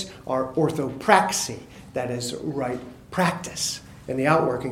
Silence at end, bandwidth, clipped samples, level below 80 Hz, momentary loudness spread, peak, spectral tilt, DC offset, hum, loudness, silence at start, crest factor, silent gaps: 0 s; 17 kHz; under 0.1%; -54 dBFS; 13 LU; 0 dBFS; -4 dB/octave; under 0.1%; none; -24 LUFS; 0 s; 24 dB; none